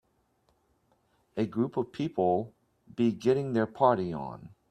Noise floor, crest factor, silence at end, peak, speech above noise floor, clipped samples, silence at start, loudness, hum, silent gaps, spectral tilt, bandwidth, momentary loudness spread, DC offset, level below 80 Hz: -71 dBFS; 22 dB; 0.25 s; -10 dBFS; 43 dB; under 0.1%; 1.35 s; -29 LUFS; none; none; -8 dB/octave; 9.4 kHz; 16 LU; under 0.1%; -66 dBFS